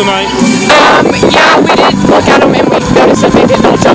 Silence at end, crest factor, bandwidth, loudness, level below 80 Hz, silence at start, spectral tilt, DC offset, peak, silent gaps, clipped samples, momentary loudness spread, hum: 0 s; 6 dB; 8 kHz; -6 LUFS; -30 dBFS; 0 s; -4.5 dB/octave; under 0.1%; 0 dBFS; none; 10%; 4 LU; none